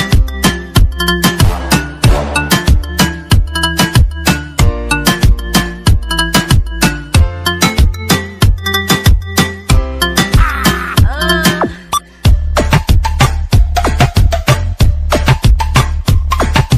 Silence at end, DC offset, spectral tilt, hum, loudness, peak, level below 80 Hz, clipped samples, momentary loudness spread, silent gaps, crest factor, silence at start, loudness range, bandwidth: 0 s; under 0.1%; -4.5 dB/octave; none; -12 LUFS; 0 dBFS; -14 dBFS; under 0.1%; 3 LU; none; 10 dB; 0 s; 1 LU; 16 kHz